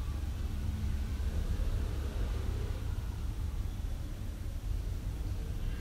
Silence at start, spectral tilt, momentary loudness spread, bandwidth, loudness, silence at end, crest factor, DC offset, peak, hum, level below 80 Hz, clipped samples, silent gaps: 0 s; -6.5 dB/octave; 4 LU; 16 kHz; -38 LUFS; 0 s; 12 dB; under 0.1%; -22 dBFS; none; -36 dBFS; under 0.1%; none